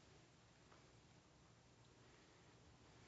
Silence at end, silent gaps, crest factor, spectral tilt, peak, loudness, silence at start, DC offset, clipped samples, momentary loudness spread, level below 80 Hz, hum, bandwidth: 0 s; none; 18 dB; -4 dB/octave; -52 dBFS; -69 LUFS; 0 s; under 0.1%; under 0.1%; 2 LU; -80 dBFS; 60 Hz at -80 dBFS; 7.6 kHz